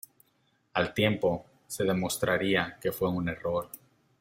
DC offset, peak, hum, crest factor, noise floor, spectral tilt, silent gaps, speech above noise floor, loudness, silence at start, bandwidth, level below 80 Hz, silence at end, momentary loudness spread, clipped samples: under 0.1%; -10 dBFS; none; 20 dB; -71 dBFS; -5 dB/octave; none; 42 dB; -29 LUFS; 0.75 s; 16.5 kHz; -60 dBFS; 0.45 s; 10 LU; under 0.1%